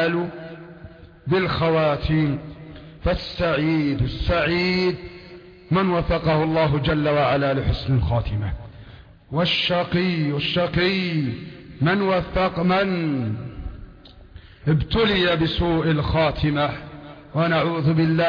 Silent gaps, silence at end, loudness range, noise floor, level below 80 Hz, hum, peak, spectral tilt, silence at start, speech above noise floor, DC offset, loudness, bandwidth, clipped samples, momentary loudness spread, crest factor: none; 0 s; 2 LU; -45 dBFS; -36 dBFS; none; -8 dBFS; -8 dB/octave; 0 s; 24 dB; under 0.1%; -21 LUFS; 5.4 kHz; under 0.1%; 16 LU; 14 dB